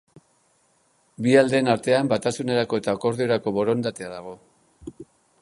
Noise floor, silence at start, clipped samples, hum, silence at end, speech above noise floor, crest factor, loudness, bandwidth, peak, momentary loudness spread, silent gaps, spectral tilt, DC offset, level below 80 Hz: -64 dBFS; 1.2 s; under 0.1%; none; 0.4 s; 42 dB; 20 dB; -22 LUFS; 11.5 kHz; -4 dBFS; 23 LU; none; -5.5 dB/octave; under 0.1%; -62 dBFS